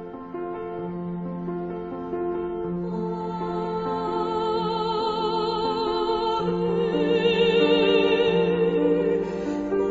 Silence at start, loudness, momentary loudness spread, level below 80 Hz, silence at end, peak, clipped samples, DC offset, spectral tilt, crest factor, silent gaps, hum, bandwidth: 0 s; -24 LUFS; 12 LU; -50 dBFS; 0 s; -8 dBFS; under 0.1%; under 0.1%; -7 dB/octave; 16 dB; none; none; 7.8 kHz